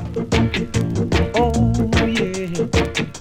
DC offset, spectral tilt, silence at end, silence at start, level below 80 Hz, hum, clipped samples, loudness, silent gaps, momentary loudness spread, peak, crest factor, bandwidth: under 0.1%; -6 dB/octave; 0 s; 0 s; -30 dBFS; none; under 0.1%; -19 LUFS; none; 4 LU; -2 dBFS; 16 dB; 15.5 kHz